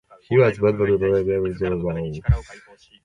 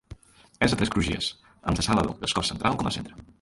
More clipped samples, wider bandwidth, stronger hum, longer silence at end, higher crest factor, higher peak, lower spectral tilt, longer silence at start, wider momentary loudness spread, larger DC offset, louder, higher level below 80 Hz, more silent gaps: neither; second, 9.2 kHz vs 11.5 kHz; neither; first, 0.45 s vs 0.15 s; about the same, 16 dB vs 20 dB; first, -4 dBFS vs -8 dBFS; first, -9 dB/octave vs -4.5 dB/octave; first, 0.3 s vs 0.1 s; about the same, 7 LU vs 9 LU; neither; first, -21 LUFS vs -26 LUFS; first, -34 dBFS vs -42 dBFS; neither